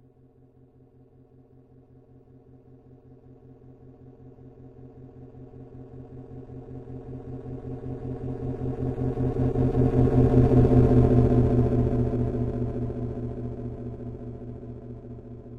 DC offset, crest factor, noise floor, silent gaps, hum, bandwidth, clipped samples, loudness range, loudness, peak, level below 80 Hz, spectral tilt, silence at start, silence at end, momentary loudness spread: under 0.1%; 20 dB; -56 dBFS; none; none; 3.8 kHz; under 0.1%; 23 LU; -24 LUFS; -6 dBFS; -36 dBFS; -11.5 dB/octave; 3.65 s; 0 s; 25 LU